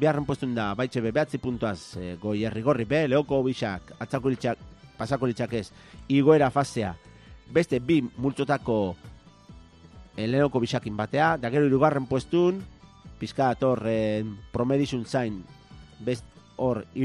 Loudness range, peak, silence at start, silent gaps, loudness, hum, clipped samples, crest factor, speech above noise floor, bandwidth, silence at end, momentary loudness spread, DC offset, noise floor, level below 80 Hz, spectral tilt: 3 LU; -6 dBFS; 0 s; none; -26 LUFS; none; under 0.1%; 20 dB; 24 dB; 11.5 kHz; 0 s; 12 LU; under 0.1%; -50 dBFS; -52 dBFS; -7 dB/octave